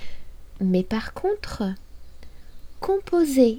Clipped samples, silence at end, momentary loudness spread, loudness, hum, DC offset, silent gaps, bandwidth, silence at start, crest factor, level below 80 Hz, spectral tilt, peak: under 0.1%; 0 s; 11 LU; -25 LUFS; none; under 0.1%; none; 18 kHz; 0 s; 18 dB; -42 dBFS; -6.5 dB/octave; -6 dBFS